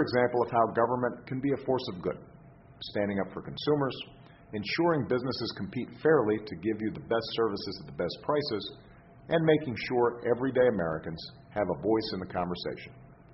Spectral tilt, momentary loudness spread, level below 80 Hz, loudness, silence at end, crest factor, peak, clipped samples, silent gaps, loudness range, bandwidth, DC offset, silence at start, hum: -4.5 dB/octave; 12 LU; -60 dBFS; -30 LUFS; 0 s; 18 dB; -12 dBFS; under 0.1%; none; 3 LU; 6 kHz; under 0.1%; 0 s; none